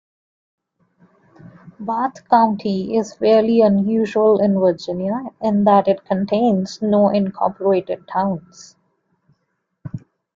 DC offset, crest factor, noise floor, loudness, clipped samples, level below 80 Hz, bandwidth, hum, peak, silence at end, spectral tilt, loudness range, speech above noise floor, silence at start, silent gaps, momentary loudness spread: under 0.1%; 18 dB; -72 dBFS; -18 LUFS; under 0.1%; -60 dBFS; 7.6 kHz; none; -2 dBFS; 0.4 s; -7.5 dB/octave; 5 LU; 55 dB; 1.65 s; none; 11 LU